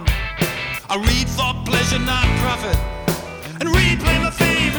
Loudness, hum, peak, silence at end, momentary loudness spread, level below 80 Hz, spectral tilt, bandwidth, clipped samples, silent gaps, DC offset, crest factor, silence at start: -19 LUFS; none; -2 dBFS; 0 s; 8 LU; -24 dBFS; -4.5 dB/octave; over 20 kHz; under 0.1%; none; under 0.1%; 16 dB; 0 s